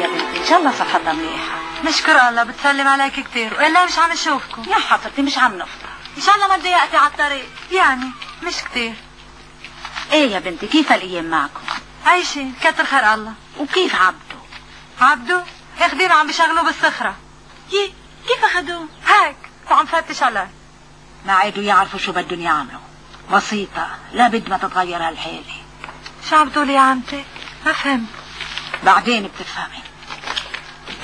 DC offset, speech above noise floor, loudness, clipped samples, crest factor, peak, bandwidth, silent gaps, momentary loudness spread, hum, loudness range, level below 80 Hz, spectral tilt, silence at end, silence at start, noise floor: 0.2%; 27 dB; -16 LUFS; under 0.1%; 18 dB; 0 dBFS; 11 kHz; none; 17 LU; none; 4 LU; -48 dBFS; -2.5 dB/octave; 0 s; 0 s; -44 dBFS